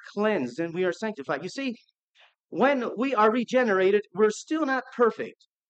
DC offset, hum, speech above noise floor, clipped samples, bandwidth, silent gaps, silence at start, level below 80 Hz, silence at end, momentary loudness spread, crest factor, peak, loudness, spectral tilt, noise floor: under 0.1%; none; 37 dB; under 0.1%; 8.8 kHz; 2.00-2.14 s, 2.44-2.49 s; 0.05 s; -86 dBFS; 0.4 s; 11 LU; 18 dB; -8 dBFS; -26 LUFS; -5 dB/octave; -62 dBFS